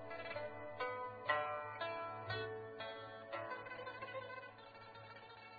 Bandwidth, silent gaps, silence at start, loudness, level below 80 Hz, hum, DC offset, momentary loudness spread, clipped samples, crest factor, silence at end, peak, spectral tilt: 4.9 kHz; none; 0 s; -46 LUFS; -78 dBFS; none; under 0.1%; 16 LU; under 0.1%; 24 dB; 0 s; -24 dBFS; -2 dB/octave